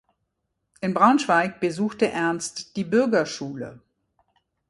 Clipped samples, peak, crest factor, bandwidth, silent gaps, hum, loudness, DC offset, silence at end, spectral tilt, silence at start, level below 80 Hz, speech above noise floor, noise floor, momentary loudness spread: under 0.1%; -4 dBFS; 20 dB; 11.5 kHz; none; none; -23 LUFS; under 0.1%; 0.9 s; -5 dB/octave; 0.8 s; -66 dBFS; 55 dB; -77 dBFS; 14 LU